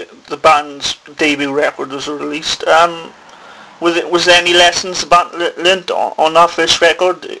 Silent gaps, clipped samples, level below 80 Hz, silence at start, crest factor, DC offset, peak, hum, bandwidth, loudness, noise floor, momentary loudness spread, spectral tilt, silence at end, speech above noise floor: none; under 0.1%; -48 dBFS; 0 s; 14 dB; under 0.1%; 0 dBFS; none; 11 kHz; -12 LUFS; -37 dBFS; 11 LU; -2 dB/octave; 0 s; 24 dB